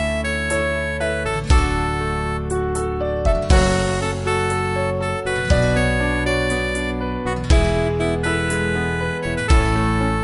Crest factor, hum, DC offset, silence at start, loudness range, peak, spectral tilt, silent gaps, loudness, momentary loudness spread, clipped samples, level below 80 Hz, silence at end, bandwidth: 16 dB; none; under 0.1%; 0 s; 1 LU; -4 dBFS; -5.5 dB/octave; none; -20 LUFS; 6 LU; under 0.1%; -24 dBFS; 0 s; 11.5 kHz